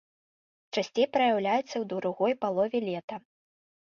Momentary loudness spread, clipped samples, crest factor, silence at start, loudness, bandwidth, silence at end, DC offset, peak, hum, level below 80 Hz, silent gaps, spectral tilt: 10 LU; under 0.1%; 18 dB; 0.75 s; -29 LUFS; 7.2 kHz; 0.75 s; under 0.1%; -12 dBFS; none; -76 dBFS; 3.04-3.08 s; -5 dB/octave